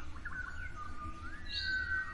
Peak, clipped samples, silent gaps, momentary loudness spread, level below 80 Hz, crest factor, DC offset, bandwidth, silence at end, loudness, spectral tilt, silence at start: -26 dBFS; under 0.1%; none; 11 LU; -48 dBFS; 14 dB; under 0.1%; 11 kHz; 0 s; -40 LUFS; -3.5 dB/octave; 0 s